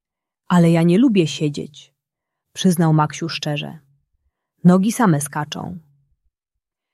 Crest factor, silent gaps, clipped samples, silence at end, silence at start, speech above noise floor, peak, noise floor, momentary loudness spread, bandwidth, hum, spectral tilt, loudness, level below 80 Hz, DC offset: 16 dB; none; under 0.1%; 1.15 s; 0.5 s; 66 dB; -2 dBFS; -83 dBFS; 18 LU; 13.5 kHz; none; -6 dB/octave; -18 LUFS; -62 dBFS; under 0.1%